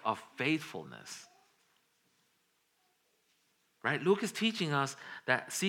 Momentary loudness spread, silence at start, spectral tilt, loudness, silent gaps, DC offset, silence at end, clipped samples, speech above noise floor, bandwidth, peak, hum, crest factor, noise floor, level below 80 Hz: 16 LU; 0.05 s; -4 dB/octave; -33 LUFS; none; under 0.1%; 0 s; under 0.1%; 42 dB; 17.5 kHz; -12 dBFS; none; 24 dB; -76 dBFS; under -90 dBFS